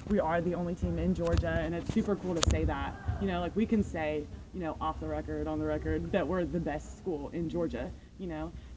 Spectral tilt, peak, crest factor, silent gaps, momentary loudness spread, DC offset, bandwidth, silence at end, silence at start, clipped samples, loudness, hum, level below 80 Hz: -6.5 dB/octave; -4 dBFS; 28 dB; none; 9 LU; under 0.1%; 8 kHz; 0 s; 0 s; under 0.1%; -33 LUFS; none; -40 dBFS